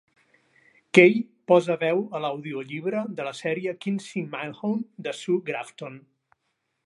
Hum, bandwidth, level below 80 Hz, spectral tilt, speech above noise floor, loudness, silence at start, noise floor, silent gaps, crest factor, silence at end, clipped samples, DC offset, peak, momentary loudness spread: none; 11.5 kHz; -80 dBFS; -6 dB/octave; 52 dB; -25 LUFS; 0.95 s; -77 dBFS; none; 24 dB; 0.9 s; under 0.1%; under 0.1%; 0 dBFS; 15 LU